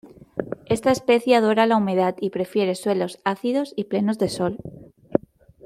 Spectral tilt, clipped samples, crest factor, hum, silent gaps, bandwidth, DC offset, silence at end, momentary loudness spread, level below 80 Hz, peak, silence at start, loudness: -5.5 dB/octave; under 0.1%; 20 dB; none; none; 15 kHz; under 0.1%; 0.5 s; 13 LU; -58 dBFS; -2 dBFS; 0.05 s; -22 LUFS